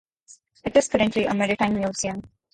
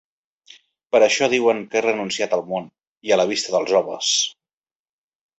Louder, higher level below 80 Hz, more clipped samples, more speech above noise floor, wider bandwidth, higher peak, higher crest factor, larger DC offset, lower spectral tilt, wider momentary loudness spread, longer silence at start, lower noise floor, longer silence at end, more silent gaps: second, -23 LUFS vs -20 LUFS; first, -52 dBFS vs -66 dBFS; neither; second, 32 dB vs over 71 dB; first, 11 kHz vs 8.2 kHz; about the same, -6 dBFS vs -4 dBFS; about the same, 18 dB vs 18 dB; neither; first, -4.5 dB/octave vs -2 dB/octave; about the same, 10 LU vs 8 LU; second, 0.65 s vs 0.95 s; second, -54 dBFS vs under -90 dBFS; second, 0.25 s vs 1.1 s; second, none vs 2.87-2.96 s